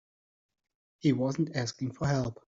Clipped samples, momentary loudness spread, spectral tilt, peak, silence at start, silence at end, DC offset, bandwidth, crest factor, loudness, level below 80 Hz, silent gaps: under 0.1%; 5 LU; -6.5 dB/octave; -14 dBFS; 1.05 s; 0.15 s; under 0.1%; 7.8 kHz; 18 dB; -31 LUFS; -60 dBFS; none